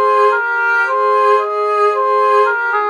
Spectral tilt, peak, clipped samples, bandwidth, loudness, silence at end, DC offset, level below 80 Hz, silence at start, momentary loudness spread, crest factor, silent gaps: -1 dB/octave; -2 dBFS; under 0.1%; 10.5 kHz; -13 LUFS; 0 s; under 0.1%; -84 dBFS; 0 s; 2 LU; 12 dB; none